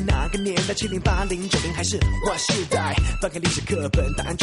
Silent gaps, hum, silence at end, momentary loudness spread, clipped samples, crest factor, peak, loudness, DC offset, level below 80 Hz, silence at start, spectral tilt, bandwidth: none; none; 0 s; 3 LU; under 0.1%; 14 dB; -8 dBFS; -23 LUFS; under 0.1%; -28 dBFS; 0 s; -4 dB/octave; 11.5 kHz